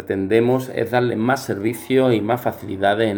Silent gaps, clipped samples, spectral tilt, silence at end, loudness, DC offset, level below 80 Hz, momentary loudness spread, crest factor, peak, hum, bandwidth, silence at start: none; under 0.1%; -6.5 dB/octave; 0 s; -20 LUFS; under 0.1%; -62 dBFS; 6 LU; 18 dB; -2 dBFS; none; over 20 kHz; 0 s